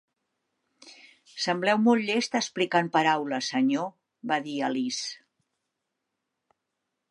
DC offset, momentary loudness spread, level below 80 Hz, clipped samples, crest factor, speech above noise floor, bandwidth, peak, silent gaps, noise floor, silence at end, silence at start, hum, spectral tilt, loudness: under 0.1%; 14 LU; -82 dBFS; under 0.1%; 20 dB; 57 dB; 11.5 kHz; -8 dBFS; none; -83 dBFS; 1.95 s; 0.85 s; none; -4 dB/octave; -26 LUFS